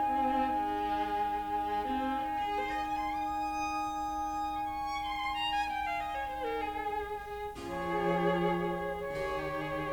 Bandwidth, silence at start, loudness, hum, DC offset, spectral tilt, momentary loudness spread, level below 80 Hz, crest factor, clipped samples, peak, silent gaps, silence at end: over 20 kHz; 0 s; -34 LUFS; none; under 0.1%; -5.5 dB/octave; 6 LU; -52 dBFS; 16 dB; under 0.1%; -18 dBFS; none; 0 s